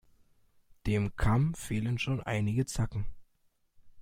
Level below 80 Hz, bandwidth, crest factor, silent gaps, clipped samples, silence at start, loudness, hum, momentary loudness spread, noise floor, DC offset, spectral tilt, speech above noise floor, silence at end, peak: -44 dBFS; 16 kHz; 18 dB; none; under 0.1%; 0.85 s; -32 LUFS; none; 9 LU; -71 dBFS; under 0.1%; -6.5 dB/octave; 41 dB; 0 s; -16 dBFS